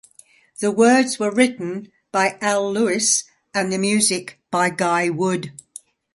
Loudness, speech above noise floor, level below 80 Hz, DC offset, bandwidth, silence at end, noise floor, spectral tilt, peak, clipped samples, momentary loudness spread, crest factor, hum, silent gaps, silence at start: -19 LUFS; 33 dB; -66 dBFS; under 0.1%; 12 kHz; 0.65 s; -52 dBFS; -3.5 dB/octave; -2 dBFS; under 0.1%; 11 LU; 18 dB; none; none; 0.6 s